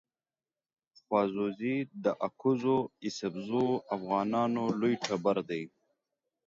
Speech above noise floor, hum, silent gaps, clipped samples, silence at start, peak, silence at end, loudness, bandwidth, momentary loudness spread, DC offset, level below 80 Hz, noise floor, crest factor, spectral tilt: over 59 dB; none; none; under 0.1%; 1.1 s; -12 dBFS; 0.8 s; -32 LUFS; 7.8 kHz; 7 LU; under 0.1%; -74 dBFS; under -90 dBFS; 20 dB; -6 dB/octave